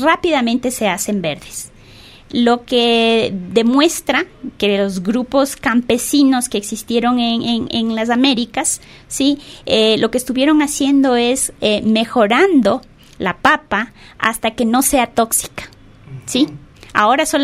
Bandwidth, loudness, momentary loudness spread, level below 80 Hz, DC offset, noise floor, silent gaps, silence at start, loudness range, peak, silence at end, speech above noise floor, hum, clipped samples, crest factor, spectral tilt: 16 kHz; -15 LUFS; 10 LU; -46 dBFS; under 0.1%; -41 dBFS; none; 0 s; 2 LU; 0 dBFS; 0 s; 26 dB; none; under 0.1%; 16 dB; -3 dB/octave